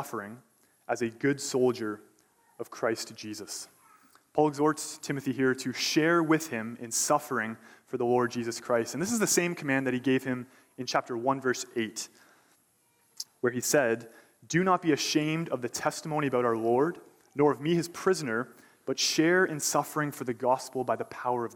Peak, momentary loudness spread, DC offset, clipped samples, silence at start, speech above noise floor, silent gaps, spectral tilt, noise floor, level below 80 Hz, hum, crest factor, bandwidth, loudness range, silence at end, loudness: -10 dBFS; 14 LU; under 0.1%; under 0.1%; 0 s; 40 dB; none; -4 dB/octave; -68 dBFS; -74 dBFS; none; 18 dB; 19 kHz; 5 LU; 0 s; -29 LUFS